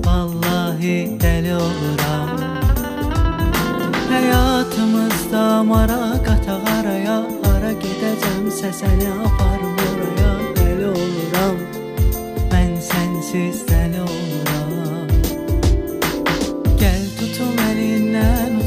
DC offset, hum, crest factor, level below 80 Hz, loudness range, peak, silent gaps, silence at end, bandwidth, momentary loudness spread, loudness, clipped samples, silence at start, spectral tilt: under 0.1%; none; 16 dB; -22 dBFS; 3 LU; -2 dBFS; none; 0 s; 15.5 kHz; 5 LU; -19 LUFS; under 0.1%; 0 s; -6 dB/octave